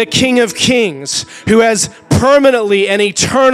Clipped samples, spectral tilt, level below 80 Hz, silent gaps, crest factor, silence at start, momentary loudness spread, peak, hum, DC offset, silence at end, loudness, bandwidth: under 0.1%; -3.5 dB/octave; -40 dBFS; none; 12 dB; 0 s; 7 LU; 0 dBFS; none; under 0.1%; 0 s; -11 LUFS; 15.5 kHz